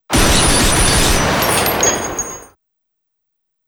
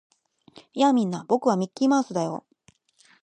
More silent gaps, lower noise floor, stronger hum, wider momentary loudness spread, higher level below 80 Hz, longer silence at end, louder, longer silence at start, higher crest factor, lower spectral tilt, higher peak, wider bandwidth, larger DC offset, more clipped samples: neither; first, -73 dBFS vs -62 dBFS; neither; about the same, 11 LU vs 11 LU; first, -24 dBFS vs -76 dBFS; first, 1.25 s vs 0.85 s; first, -13 LUFS vs -24 LUFS; second, 0.1 s vs 0.75 s; about the same, 14 dB vs 18 dB; second, -2.5 dB/octave vs -6 dB/octave; first, -2 dBFS vs -8 dBFS; first, 19 kHz vs 9.6 kHz; neither; neither